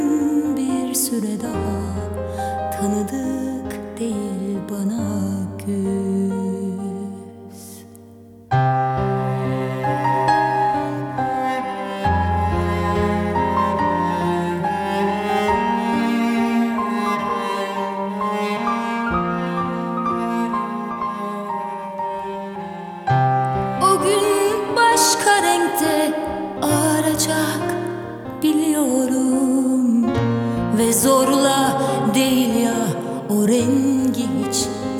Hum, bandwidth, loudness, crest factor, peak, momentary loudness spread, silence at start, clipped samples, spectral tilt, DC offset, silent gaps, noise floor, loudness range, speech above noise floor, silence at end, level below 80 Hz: none; 19 kHz; -20 LUFS; 18 dB; -2 dBFS; 10 LU; 0 s; under 0.1%; -5 dB/octave; under 0.1%; none; -43 dBFS; 7 LU; 21 dB; 0 s; -44 dBFS